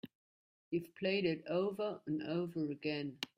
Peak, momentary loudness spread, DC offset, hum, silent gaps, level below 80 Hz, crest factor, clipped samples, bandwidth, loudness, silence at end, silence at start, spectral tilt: -20 dBFS; 6 LU; under 0.1%; none; 0.15-0.71 s; -80 dBFS; 20 dB; under 0.1%; 15.5 kHz; -39 LUFS; 0.1 s; 0.05 s; -6.5 dB/octave